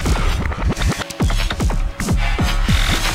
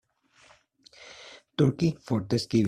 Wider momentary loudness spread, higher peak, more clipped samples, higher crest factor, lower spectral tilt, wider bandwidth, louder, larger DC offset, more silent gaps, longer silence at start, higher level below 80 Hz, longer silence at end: second, 4 LU vs 22 LU; first, -2 dBFS vs -10 dBFS; neither; about the same, 16 dB vs 18 dB; second, -4.5 dB/octave vs -7 dB/octave; first, 16 kHz vs 13 kHz; first, -20 LUFS vs -27 LUFS; neither; neither; second, 0 s vs 1.05 s; first, -20 dBFS vs -60 dBFS; about the same, 0 s vs 0 s